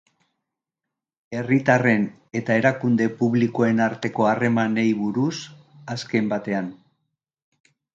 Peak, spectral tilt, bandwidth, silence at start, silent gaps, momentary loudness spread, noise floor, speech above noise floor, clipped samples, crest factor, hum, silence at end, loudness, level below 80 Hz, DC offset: -4 dBFS; -7 dB/octave; 7.6 kHz; 1.3 s; none; 14 LU; -86 dBFS; 64 dB; under 0.1%; 20 dB; none; 1.2 s; -22 LUFS; -66 dBFS; under 0.1%